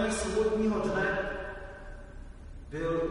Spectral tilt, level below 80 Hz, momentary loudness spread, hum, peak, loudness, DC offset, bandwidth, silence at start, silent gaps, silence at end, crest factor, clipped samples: -5 dB/octave; -44 dBFS; 21 LU; none; -18 dBFS; -31 LUFS; under 0.1%; 10.5 kHz; 0 s; none; 0 s; 14 dB; under 0.1%